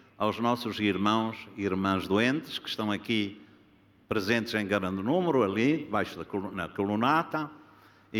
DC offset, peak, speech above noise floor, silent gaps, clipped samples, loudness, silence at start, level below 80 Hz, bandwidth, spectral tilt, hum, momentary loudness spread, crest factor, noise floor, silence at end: under 0.1%; -10 dBFS; 32 dB; none; under 0.1%; -29 LUFS; 0.2 s; -66 dBFS; 17 kHz; -6 dB/octave; none; 9 LU; 18 dB; -61 dBFS; 0 s